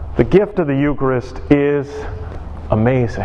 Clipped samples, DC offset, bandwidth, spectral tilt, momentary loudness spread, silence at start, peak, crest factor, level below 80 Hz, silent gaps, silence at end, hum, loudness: under 0.1%; under 0.1%; 7.8 kHz; -9 dB/octave; 15 LU; 0 s; 0 dBFS; 16 dB; -30 dBFS; none; 0 s; none; -16 LUFS